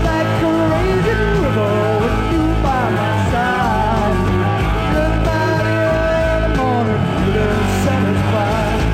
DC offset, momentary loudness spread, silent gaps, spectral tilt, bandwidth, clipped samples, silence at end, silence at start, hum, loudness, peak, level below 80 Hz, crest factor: under 0.1%; 1 LU; none; -7 dB/octave; 15.5 kHz; under 0.1%; 0 s; 0 s; none; -16 LUFS; -6 dBFS; -24 dBFS; 10 dB